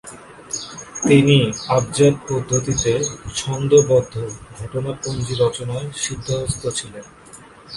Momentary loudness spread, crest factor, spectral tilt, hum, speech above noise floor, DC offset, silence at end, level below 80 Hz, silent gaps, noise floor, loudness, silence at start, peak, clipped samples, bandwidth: 15 LU; 18 dB; -5 dB/octave; none; 24 dB; under 0.1%; 0 s; -44 dBFS; none; -43 dBFS; -19 LUFS; 0.05 s; 0 dBFS; under 0.1%; 11.5 kHz